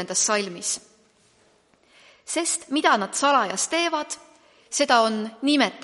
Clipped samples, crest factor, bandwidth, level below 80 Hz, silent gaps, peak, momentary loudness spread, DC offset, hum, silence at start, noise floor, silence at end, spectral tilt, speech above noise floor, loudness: under 0.1%; 20 dB; 11.5 kHz; -76 dBFS; none; -6 dBFS; 9 LU; under 0.1%; none; 0 s; -61 dBFS; 0 s; -1.5 dB/octave; 38 dB; -22 LUFS